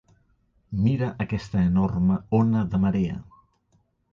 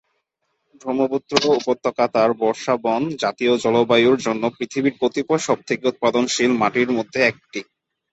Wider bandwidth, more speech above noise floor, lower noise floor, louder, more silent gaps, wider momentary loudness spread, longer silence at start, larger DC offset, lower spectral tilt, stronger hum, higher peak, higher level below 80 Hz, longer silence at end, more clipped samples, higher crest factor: second, 7.2 kHz vs 8.2 kHz; second, 44 dB vs 54 dB; second, -67 dBFS vs -73 dBFS; second, -24 LUFS vs -19 LUFS; neither; about the same, 8 LU vs 6 LU; second, 0.7 s vs 0.85 s; neither; first, -9.5 dB/octave vs -4 dB/octave; neither; second, -10 dBFS vs 0 dBFS; first, -44 dBFS vs -64 dBFS; first, 0.9 s vs 0.5 s; neither; second, 14 dB vs 20 dB